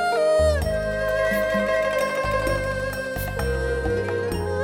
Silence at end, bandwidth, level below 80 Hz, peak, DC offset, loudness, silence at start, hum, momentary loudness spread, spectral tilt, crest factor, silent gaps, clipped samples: 0 s; 17.5 kHz; -34 dBFS; -10 dBFS; under 0.1%; -23 LUFS; 0 s; none; 7 LU; -5.5 dB/octave; 14 dB; none; under 0.1%